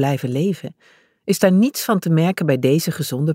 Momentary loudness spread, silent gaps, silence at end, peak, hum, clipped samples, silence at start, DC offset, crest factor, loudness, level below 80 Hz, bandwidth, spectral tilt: 10 LU; none; 0 s; -4 dBFS; none; under 0.1%; 0 s; under 0.1%; 16 dB; -18 LUFS; -64 dBFS; 16.5 kHz; -6 dB/octave